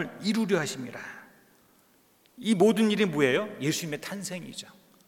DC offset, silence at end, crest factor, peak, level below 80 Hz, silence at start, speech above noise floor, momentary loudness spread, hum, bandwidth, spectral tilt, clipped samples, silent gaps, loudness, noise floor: under 0.1%; 0.35 s; 20 dB; -10 dBFS; -78 dBFS; 0 s; 36 dB; 19 LU; none; 17 kHz; -4.5 dB/octave; under 0.1%; none; -27 LUFS; -63 dBFS